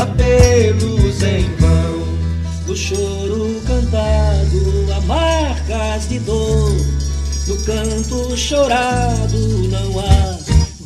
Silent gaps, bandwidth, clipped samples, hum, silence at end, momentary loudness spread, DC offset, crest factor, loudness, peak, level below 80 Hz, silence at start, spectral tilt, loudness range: none; 12.5 kHz; under 0.1%; none; 0 s; 6 LU; under 0.1%; 14 dB; -16 LUFS; 0 dBFS; -20 dBFS; 0 s; -5.5 dB/octave; 2 LU